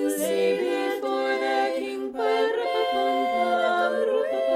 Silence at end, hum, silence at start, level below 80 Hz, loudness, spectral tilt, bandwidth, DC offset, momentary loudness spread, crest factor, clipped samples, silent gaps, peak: 0 s; none; 0 s; -72 dBFS; -24 LUFS; -3 dB/octave; 16 kHz; under 0.1%; 4 LU; 12 dB; under 0.1%; none; -12 dBFS